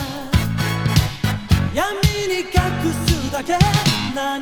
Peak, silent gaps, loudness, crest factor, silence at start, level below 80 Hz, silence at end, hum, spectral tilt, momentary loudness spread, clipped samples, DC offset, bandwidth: 0 dBFS; none; -19 LUFS; 18 dB; 0 s; -28 dBFS; 0 s; none; -5 dB/octave; 5 LU; under 0.1%; under 0.1%; 19.5 kHz